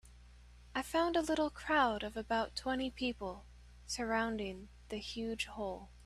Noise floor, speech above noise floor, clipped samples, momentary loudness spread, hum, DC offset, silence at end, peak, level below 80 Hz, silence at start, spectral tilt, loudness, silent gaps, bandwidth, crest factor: -58 dBFS; 21 dB; under 0.1%; 12 LU; 60 Hz at -55 dBFS; under 0.1%; 0 s; -20 dBFS; -56 dBFS; 0.05 s; -4 dB/octave; -37 LUFS; none; 14 kHz; 18 dB